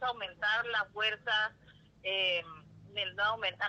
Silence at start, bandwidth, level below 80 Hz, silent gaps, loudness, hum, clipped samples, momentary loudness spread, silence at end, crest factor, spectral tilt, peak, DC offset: 0 s; 8.4 kHz; -70 dBFS; none; -32 LUFS; none; under 0.1%; 11 LU; 0 s; 16 dB; -2.5 dB/octave; -18 dBFS; under 0.1%